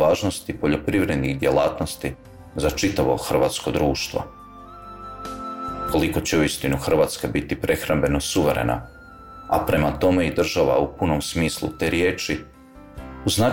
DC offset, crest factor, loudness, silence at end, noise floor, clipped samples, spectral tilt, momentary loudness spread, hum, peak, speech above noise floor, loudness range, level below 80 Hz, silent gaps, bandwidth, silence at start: 0.2%; 14 dB; -22 LUFS; 0 s; -42 dBFS; under 0.1%; -5 dB/octave; 17 LU; none; -8 dBFS; 21 dB; 3 LU; -38 dBFS; none; 17 kHz; 0 s